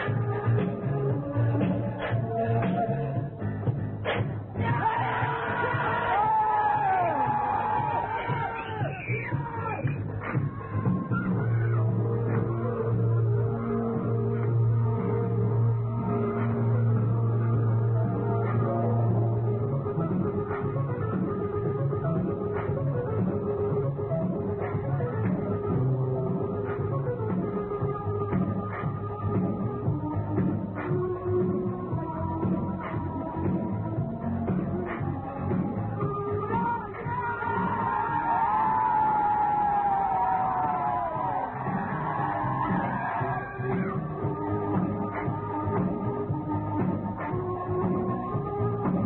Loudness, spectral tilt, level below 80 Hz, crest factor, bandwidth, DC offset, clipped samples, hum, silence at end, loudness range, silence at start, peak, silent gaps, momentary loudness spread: -28 LUFS; -12.5 dB/octave; -50 dBFS; 14 dB; 4 kHz; under 0.1%; under 0.1%; none; 0 s; 4 LU; 0 s; -14 dBFS; none; 6 LU